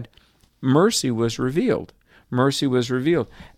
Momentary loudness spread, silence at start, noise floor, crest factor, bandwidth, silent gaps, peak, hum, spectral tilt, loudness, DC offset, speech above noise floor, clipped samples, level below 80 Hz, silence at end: 7 LU; 0 s; -57 dBFS; 18 dB; 15.5 kHz; none; -4 dBFS; none; -5.5 dB/octave; -21 LUFS; under 0.1%; 36 dB; under 0.1%; -52 dBFS; 0.1 s